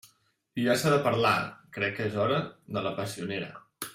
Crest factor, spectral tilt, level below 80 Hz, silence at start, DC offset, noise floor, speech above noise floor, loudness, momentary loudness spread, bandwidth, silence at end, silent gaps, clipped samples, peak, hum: 18 dB; -5 dB/octave; -68 dBFS; 0.55 s; under 0.1%; -68 dBFS; 39 dB; -29 LUFS; 13 LU; 16 kHz; 0 s; none; under 0.1%; -10 dBFS; none